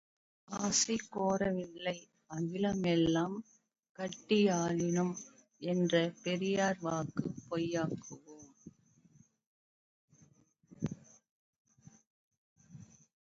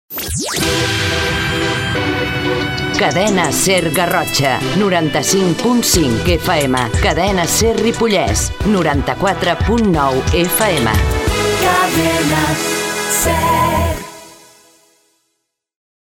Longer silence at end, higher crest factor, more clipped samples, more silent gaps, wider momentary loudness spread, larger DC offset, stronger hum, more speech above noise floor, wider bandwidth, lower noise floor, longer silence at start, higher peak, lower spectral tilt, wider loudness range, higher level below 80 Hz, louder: second, 0.5 s vs 1.7 s; first, 20 dB vs 14 dB; neither; first, 3.89-3.95 s, 9.47-10.08 s, 11.31-11.65 s, 12.07-12.31 s, 12.38-12.56 s vs none; first, 16 LU vs 4 LU; neither; neither; second, 34 dB vs 57 dB; second, 7.6 kHz vs 17 kHz; second, -67 dBFS vs -71 dBFS; first, 0.5 s vs 0.1 s; second, -16 dBFS vs 0 dBFS; about the same, -5 dB/octave vs -4 dB/octave; first, 18 LU vs 2 LU; second, -68 dBFS vs -28 dBFS; second, -34 LUFS vs -14 LUFS